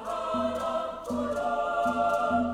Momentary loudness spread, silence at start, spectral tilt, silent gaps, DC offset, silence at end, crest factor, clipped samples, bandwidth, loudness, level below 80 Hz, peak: 6 LU; 0 s; -5.5 dB/octave; none; under 0.1%; 0 s; 14 dB; under 0.1%; 15.5 kHz; -29 LUFS; -54 dBFS; -16 dBFS